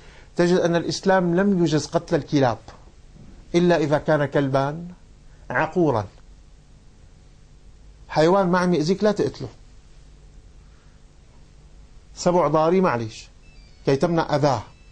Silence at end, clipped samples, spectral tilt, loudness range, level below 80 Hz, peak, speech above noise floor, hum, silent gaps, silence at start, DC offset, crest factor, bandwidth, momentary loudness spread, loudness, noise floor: 0.25 s; under 0.1%; -6.5 dB/octave; 7 LU; -48 dBFS; -6 dBFS; 29 dB; none; none; 0.35 s; under 0.1%; 16 dB; 9.4 kHz; 10 LU; -21 LUFS; -49 dBFS